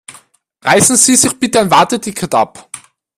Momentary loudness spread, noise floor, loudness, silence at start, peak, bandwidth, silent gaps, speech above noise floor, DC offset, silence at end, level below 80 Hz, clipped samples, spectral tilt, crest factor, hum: 20 LU; -46 dBFS; -11 LUFS; 0.1 s; 0 dBFS; over 20 kHz; none; 35 dB; under 0.1%; 0.4 s; -50 dBFS; under 0.1%; -2.5 dB/octave; 14 dB; none